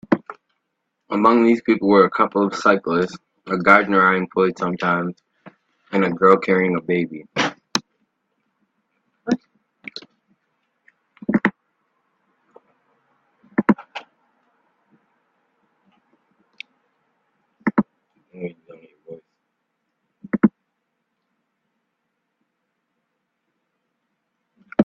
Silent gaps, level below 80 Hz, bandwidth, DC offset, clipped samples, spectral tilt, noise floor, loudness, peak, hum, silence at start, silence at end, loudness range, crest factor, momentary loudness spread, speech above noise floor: none; -64 dBFS; 8 kHz; under 0.1%; under 0.1%; -6 dB/octave; -76 dBFS; -19 LUFS; 0 dBFS; none; 0.1 s; 0 s; 13 LU; 22 dB; 22 LU; 59 dB